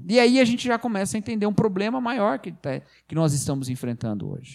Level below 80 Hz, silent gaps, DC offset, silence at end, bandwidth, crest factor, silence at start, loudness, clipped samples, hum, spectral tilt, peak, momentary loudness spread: -58 dBFS; none; under 0.1%; 0 s; 15 kHz; 18 dB; 0 s; -24 LUFS; under 0.1%; none; -5.5 dB/octave; -4 dBFS; 13 LU